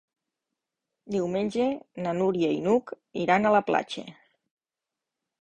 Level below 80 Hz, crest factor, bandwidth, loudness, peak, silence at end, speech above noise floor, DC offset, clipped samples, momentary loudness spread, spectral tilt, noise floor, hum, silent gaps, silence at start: -66 dBFS; 20 dB; 9.8 kHz; -26 LUFS; -8 dBFS; 1.3 s; 64 dB; under 0.1%; under 0.1%; 14 LU; -6.5 dB/octave; -89 dBFS; none; none; 1.05 s